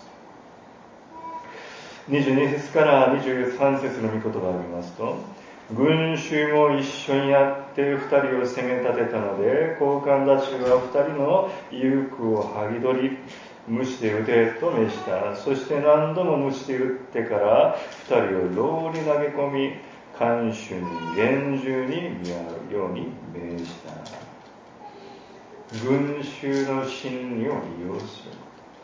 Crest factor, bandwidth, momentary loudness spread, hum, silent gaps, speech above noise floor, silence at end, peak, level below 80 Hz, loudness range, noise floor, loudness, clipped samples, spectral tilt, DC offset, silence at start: 20 dB; 7.6 kHz; 18 LU; none; none; 24 dB; 0 s; -4 dBFS; -62 dBFS; 7 LU; -47 dBFS; -23 LUFS; under 0.1%; -6.5 dB/octave; under 0.1%; 0 s